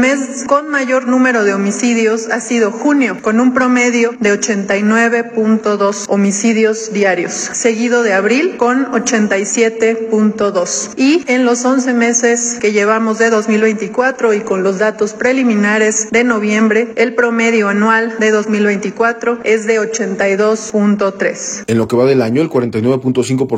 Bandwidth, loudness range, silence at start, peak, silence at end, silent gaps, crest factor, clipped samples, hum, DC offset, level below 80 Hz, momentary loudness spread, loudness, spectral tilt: 9.8 kHz; 2 LU; 0 s; 0 dBFS; 0 s; none; 12 dB; under 0.1%; none; under 0.1%; -58 dBFS; 4 LU; -13 LUFS; -4.5 dB/octave